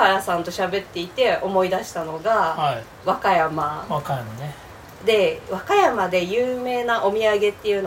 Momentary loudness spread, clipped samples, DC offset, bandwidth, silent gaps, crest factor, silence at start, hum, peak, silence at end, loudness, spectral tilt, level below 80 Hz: 10 LU; under 0.1%; under 0.1%; 16.5 kHz; none; 20 dB; 0 s; none; -2 dBFS; 0 s; -21 LUFS; -4.5 dB/octave; -54 dBFS